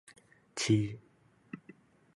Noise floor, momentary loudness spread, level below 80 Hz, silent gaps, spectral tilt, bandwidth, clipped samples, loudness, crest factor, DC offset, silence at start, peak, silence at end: -59 dBFS; 21 LU; -66 dBFS; none; -5 dB/octave; 11.5 kHz; under 0.1%; -32 LUFS; 20 dB; under 0.1%; 0.55 s; -16 dBFS; 0.6 s